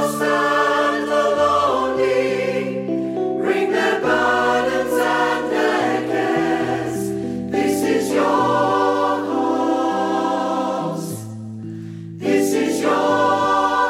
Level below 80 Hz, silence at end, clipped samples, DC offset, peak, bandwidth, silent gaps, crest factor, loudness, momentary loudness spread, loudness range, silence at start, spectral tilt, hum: -54 dBFS; 0 s; under 0.1%; under 0.1%; -4 dBFS; 16 kHz; none; 14 dB; -19 LUFS; 8 LU; 3 LU; 0 s; -5 dB/octave; none